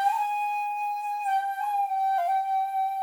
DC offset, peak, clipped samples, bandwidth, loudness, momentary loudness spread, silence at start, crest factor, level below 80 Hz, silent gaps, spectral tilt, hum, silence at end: under 0.1%; -14 dBFS; under 0.1%; 20 kHz; -27 LUFS; 4 LU; 0 s; 12 dB; under -90 dBFS; none; 2.5 dB/octave; none; 0 s